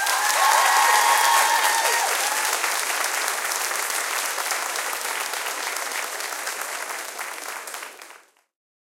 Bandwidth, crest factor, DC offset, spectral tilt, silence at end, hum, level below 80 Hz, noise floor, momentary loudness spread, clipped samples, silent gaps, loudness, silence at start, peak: 17 kHz; 20 dB; under 0.1%; 3.5 dB/octave; 0.75 s; none; -82 dBFS; -50 dBFS; 14 LU; under 0.1%; none; -21 LUFS; 0 s; -4 dBFS